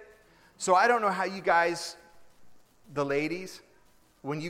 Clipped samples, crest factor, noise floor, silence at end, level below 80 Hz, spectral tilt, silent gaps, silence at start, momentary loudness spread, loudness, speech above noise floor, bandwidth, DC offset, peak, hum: under 0.1%; 20 dB; -63 dBFS; 0 s; -70 dBFS; -4 dB/octave; none; 0 s; 18 LU; -27 LUFS; 36 dB; 16 kHz; under 0.1%; -10 dBFS; none